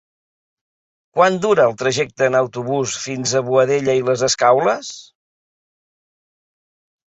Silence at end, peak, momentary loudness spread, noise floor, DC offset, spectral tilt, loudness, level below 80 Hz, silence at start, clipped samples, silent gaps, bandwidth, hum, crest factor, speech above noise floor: 2.15 s; -2 dBFS; 8 LU; under -90 dBFS; under 0.1%; -4 dB/octave; -17 LUFS; -60 dBFS; 1.15 s; under 0.1%; none; 8.2 kHz; none; 18 dB; over 73 dB